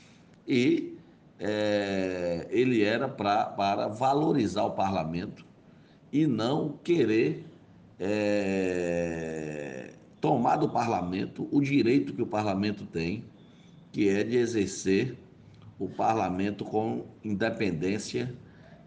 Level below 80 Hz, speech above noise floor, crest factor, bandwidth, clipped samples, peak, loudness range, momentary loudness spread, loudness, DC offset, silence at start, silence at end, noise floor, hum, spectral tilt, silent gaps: -64 dBFS; 28 dB; 16 dB; 9.6 kHz; under 0.1%; -12 dBFS; 3 LU; 11 LU; -28 LUFS; under 0.1%; 0.45 s; 0.05 s; -56 dBFS; none; -6 dB/octave; none